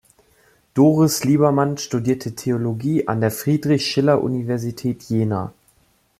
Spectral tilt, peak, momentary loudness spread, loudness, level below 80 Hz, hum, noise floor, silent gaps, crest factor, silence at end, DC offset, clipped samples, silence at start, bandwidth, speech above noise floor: -6 dB/octave; -2 dBFS; 9 LU; -20 LUFS; -58 dBFS; none; -60 dBFS; none; 18 dB; 0.7 s; under 0.1%; under 0.1%; 0.75 s; 15.5 kHz; 41 dB